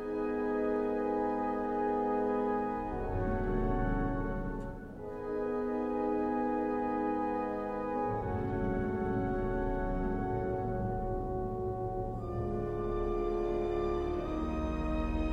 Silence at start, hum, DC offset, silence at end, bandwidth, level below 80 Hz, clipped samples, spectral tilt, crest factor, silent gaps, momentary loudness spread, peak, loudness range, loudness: 0 s; none; under 0.1%; 0 s; 7.4 kHz; -42 dBFS; under 0.1%; -9.5 dB/octave; 12 dB; none; 4 LU; -20 dBFS; 2 LU; -34 LUFS